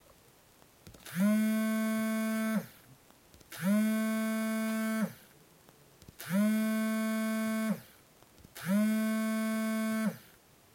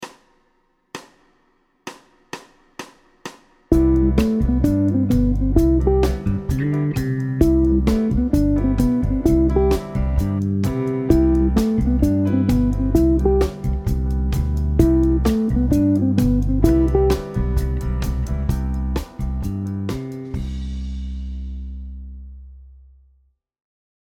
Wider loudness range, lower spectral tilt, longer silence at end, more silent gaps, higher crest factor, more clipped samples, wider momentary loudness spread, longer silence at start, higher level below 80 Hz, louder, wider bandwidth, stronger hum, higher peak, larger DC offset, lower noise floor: second, 2 LU vs 11 LU; second, -5.5 dB/octave vs -8.5 dB/octave; second, 0.55 s vs 1.35 s; neither; about the same, 14 dB vs 18 dB; neither; second, 11 LU vs 20 LU; first, 0.85 s vs 0 s; second, -74 dBFS vs -24 dBFS; second, -32 LUFS vs -19 LUFS; about the same, 16.5 kHz vs 16.5 kHz; neither; second, -18 dBFS vs 0 dBFS; neither; about the same, -62 dBFS vs -63 dBFS